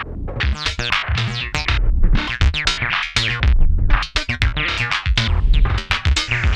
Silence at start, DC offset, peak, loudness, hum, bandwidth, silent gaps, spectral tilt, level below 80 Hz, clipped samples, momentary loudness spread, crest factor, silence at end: 0 s; under 0.1%; 0 dBFS; -19 LUFS; none; 10 kHz; none; -4 dB/octave; -18 dBFS; under 0.1%; 4 LU; 16 dB; 0 s